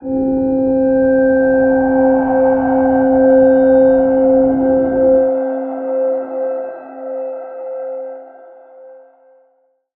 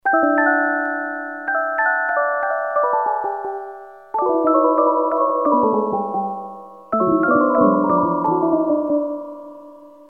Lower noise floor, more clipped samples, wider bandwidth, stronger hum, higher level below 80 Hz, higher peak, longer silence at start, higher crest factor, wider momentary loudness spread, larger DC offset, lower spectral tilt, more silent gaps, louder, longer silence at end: first, -59 dBFS vs -42 dBFS; neither; about the same, 2.8 kHz vs 2.8 kHz; neither; first, -44 dBFS vs -62 dBFS; about the same, -2 dBFS vs -2 dBFS; about the same, 0 s vs 0.05 s; about the same, 14 dB vs 16 dB; about the same, 16 LU vs 14 LU; second, under 0.1% vs 0.1%; first, -12.5 dB/octave vs -10 dB/octave; neither; first, -13 LUFS vs -18 LUFS; first, 1.05 s vs 0.2 s